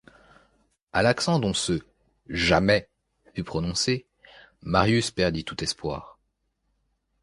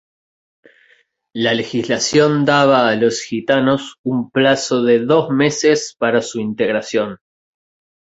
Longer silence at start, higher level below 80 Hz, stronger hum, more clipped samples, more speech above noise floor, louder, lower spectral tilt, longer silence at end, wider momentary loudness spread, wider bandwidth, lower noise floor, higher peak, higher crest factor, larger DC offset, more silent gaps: second, 0.95 s vs 1.35 s; first, -46 dBFS vs -58 dBFS; neither; neither; first, 50 dB vs 41 dB; second, -25 LUFS vs -16 LUFS; about the same, -4.5 dB/octave vs -4.5 dB/octave; first, 1.15 s vs 0.85 s; first, 13 LU vs 8 LU; first, 11.5 kHz vs 8 kHz; first, -74 dBFS vs -56 dBFS; second, -4 dBFS vs 0 dBFS; first, 24 dB vs 16 dB; neither; second, none vs 3.98-4.04 s